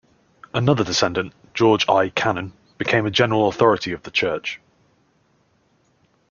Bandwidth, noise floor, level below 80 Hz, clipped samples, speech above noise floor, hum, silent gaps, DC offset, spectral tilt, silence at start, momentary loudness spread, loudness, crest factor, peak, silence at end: 7.2 kHz; -62 dBFS; -56 dBFS; under 0.1%; 43 dB; none; none; under 0.1%; -5 dB/octave; 0.55 s; 11 LU; -20 LUFS; 20 dB; -2 dBFS; 1.75 s